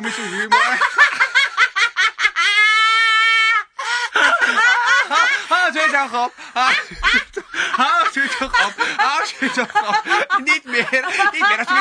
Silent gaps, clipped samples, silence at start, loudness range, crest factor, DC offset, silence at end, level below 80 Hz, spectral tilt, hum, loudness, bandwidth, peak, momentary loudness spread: none; under 0.1%; 0 s; 4 LU; 16 dB; under 0.1%; 0 s; -48 dBFS; -0.5 dB/octave; none; -15 LUFS; 10.5 kHz; 0 dBFS; 7 LU